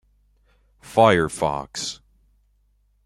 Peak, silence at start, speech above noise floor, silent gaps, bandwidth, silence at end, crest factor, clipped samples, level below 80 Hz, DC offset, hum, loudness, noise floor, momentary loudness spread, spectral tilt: -2 dBFS; 0.85 s; 44 dB; none; 15 kHz; 1.1 s; 22 dB; under 0.1%; -52 dBFS; under 0.1%; 50 Hz at -50 dBFS; -21 LUFS; -63 dBFS; 14 LU; -4.5 dB/octave